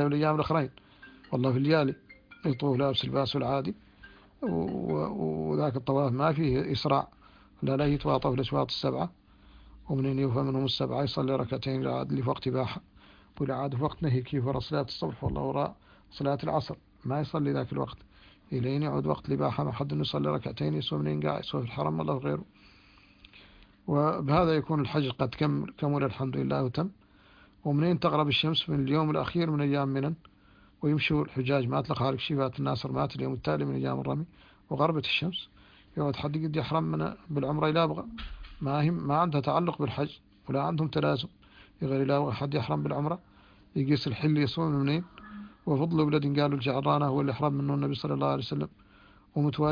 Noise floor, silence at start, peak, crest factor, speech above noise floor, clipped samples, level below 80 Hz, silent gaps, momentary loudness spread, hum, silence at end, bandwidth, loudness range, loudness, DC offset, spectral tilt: -59 dBFS; 0 s; -10 dBFS; 20 dB; 30 dB; under 0.1%; -54 dBFS; none; 9 LU; none; 0 s; 5.2 kHz; 4 LU; -30 LUFS; under 0.1%; -8.5 dB/octave